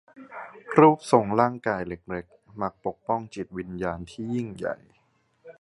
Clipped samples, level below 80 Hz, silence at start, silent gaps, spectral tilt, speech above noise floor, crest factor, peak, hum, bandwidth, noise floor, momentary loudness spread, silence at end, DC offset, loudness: under 0.1%; -56 dBFS; 0.2 s; none; -7 dB/octave; 42 dB; 24 dB; -2 dBFS; none; 11.5 kHz; -67 dBFS; 22 LU; 0.1 s; under 0.1%; -26 LUFS